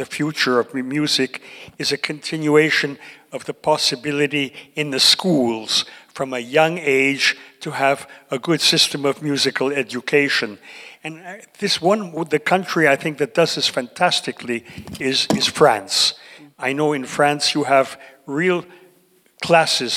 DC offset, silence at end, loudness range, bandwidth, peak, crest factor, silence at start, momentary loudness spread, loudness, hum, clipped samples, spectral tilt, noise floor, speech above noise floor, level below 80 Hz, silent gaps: under 0.1%; 0 s; 3 LU; 16.5 kHz; -2 dBFS; 18 dB; 0 s; 15 LU; -18 LUFS; none; under 0.1%; -3 dB/octave; -56 dBFS; 37 dB; -64 dBFS; none